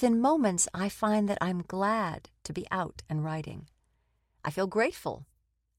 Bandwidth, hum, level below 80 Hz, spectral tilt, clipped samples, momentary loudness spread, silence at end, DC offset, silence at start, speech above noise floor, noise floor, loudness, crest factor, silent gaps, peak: 16 kHz; none; -60 dBFS; -5 dB/octave; under 0.1%; 14 LU; 0.55 s; under 0.1%; 0 s; 44 dB; -73 dBFS; -30 LUFS; 18 dB; none; -12 dBFS